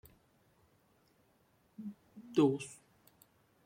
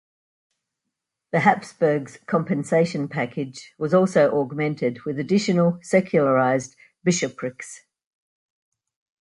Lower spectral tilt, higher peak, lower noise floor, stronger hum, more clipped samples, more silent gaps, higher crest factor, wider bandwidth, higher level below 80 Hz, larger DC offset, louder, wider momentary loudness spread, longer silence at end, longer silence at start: about the same, -6.5 dB/octave vs -6 dB/octave; second, -18 dBFS vs -4 dBFS; second, -72 dBFS vs -83 dBFS; neither; neither; neither; about the same, 22 dB vs 20 dB; first, 16.5 kHz vs 11.5 kHz; second, -78 dBFS vs -66 dBFS; neither; second, -33 LUFS vs -22 LUFS; first, 24 LU vs 12 LU; second, 0.9 s vs 1.4 s; first, 1.8 s vs 1.35 s